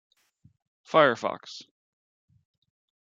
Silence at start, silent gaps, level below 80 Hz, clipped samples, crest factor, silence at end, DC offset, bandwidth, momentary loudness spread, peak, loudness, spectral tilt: 0.95 s; none; -80 dBFS; under 0.1%; 26 dB; 1.4 s; under 0.1%; 7.6 kHz; 22 LU; -4 dBFS; -24 LUFS; -4.5 dB/octave